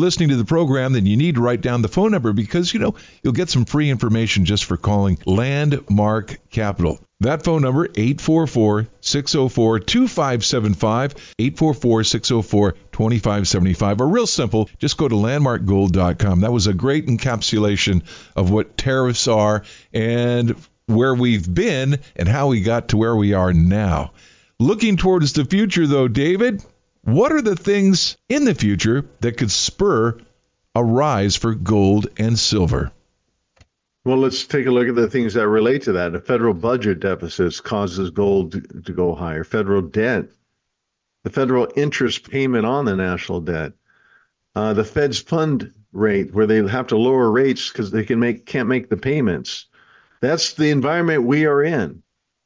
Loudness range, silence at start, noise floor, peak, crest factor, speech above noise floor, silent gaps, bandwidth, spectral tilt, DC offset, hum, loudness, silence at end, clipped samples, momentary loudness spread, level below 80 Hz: 4 LU; 0 s; -77 dBFS; -6 dBFS; 12 dB; 59 dB; none; 7.6 kHz; -5.5 dB/octave; under 0.1%; none; -18 LUFS; 0.5 s; under 0.1%; 7 LU; -36 dBFS